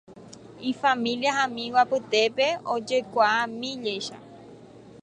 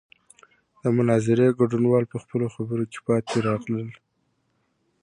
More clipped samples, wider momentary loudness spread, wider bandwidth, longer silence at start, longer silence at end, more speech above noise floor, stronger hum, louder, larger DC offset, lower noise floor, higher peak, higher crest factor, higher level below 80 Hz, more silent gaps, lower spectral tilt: neither; about the same, 10 LU vs 10 LU; about the same, 10.5 kHz vs 10.5 kHz; second, 0.1 s vs 0.85 s; second, 0.05 s vs 1.1 s; second, 23 dB vs 49 dB; neither; about the same, -25 LUFS vs -23 LUFS; neither; second, -47 dBFS vs -71 dBFS; about the same, -8 dBFS vs -8 dBFS; about the same, 18 dB vs 18 dB; second, -70 dBFS vs -62 dBFS; neither; second, -3 dB/octave vs -7.5 dB/octave